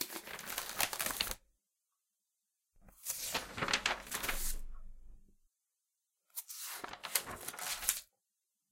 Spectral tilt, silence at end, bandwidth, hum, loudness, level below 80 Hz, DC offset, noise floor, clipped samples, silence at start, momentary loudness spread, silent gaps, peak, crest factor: -0.5 dB/octave; 0.65 s; 17 kHz; none; -38 LUFS; -52 dBFS; under 0.1%; -87 dBFS; under 0.1%; 0 s; 12 LU; none; -10 dBFS; 32 dB